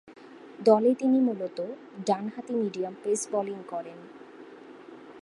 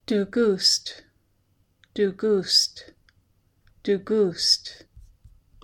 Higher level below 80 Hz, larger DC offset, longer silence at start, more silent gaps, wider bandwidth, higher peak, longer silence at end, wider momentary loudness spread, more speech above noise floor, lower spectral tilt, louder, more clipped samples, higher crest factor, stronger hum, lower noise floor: second, -82 dBFS vs -60 dBFS; neither; about the same, 0.05 s vs 0.1 s; neither; second, 11.5 kHz vs 17 kHz; about the same, -6 dBFS vs -6 dBFS; second, 0 s vs 0.65 s; first, 25 LU vs 15 LU; second, 20 dB vs 43 dB; first, -5.5 dB/octave vs -3 dB/octave; second, -28 LUFS vs -22 LUFS; neither; about the same, 22 dB vs 20 dB; neither; second, -47 dBFS vs -66 dBFS